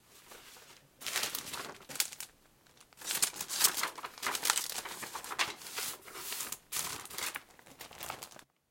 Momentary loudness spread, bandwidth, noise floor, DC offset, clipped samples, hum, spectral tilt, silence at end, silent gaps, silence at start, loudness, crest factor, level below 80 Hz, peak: 20 LU; 17 kHz; -64 dBFS; under 0.1%; under 0.1%; none; 1 dB/octave; 0.25 s; none; 0.1 s; -35 LUFS; 32 dB; -74 dBFS; -8 dBFS